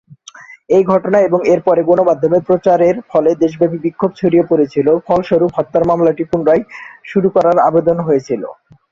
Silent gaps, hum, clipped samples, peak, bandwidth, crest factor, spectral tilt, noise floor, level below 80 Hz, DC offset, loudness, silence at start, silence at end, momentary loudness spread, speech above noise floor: none; none; under 0.1%; 0 dBFS; 7.2 kHz; 12 dB; -8 dB/octave; -38 dBFS; -52 dBFS; under 0.1%; -13 LUFS; 0.4 s; 0.4 s; 5 LU; 25 dB